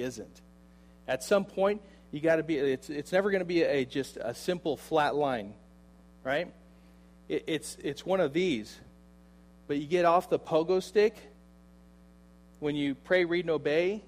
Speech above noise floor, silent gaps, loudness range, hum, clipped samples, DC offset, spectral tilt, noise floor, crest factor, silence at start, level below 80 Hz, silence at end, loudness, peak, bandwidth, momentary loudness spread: 27 dB; none; 4 LU; none; under 0.1%; under 0.1%; -5.5 dB/octave; -56 dBFS; 18 dB; 0 s; -60 dBFS; 0.05 s; -30 LUFS; -12 dBFS; 15.5 kHz; 10 LU